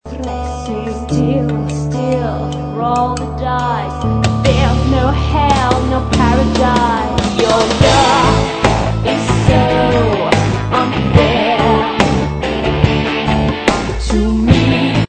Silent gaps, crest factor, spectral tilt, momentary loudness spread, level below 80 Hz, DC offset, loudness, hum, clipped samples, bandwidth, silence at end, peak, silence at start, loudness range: none; 14 dB; -6 dB/octave; 7 LU; -24 dBFS; 0.2%; -14 LUFS; none; 0.2%; 9.2 kHz; 0 s; 0 dBFS; 0.05 s; 5 LU